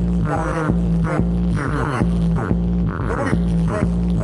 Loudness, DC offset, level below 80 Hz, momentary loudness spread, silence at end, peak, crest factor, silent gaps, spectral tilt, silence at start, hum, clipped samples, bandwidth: -20 LUFS; under 0.1%; -26 dBFS; 2 LU; 0 s; -4 dBFS; 14 dB; none; -8.5 dB/octave; 0 s; none; under 0.1%; 11 kHz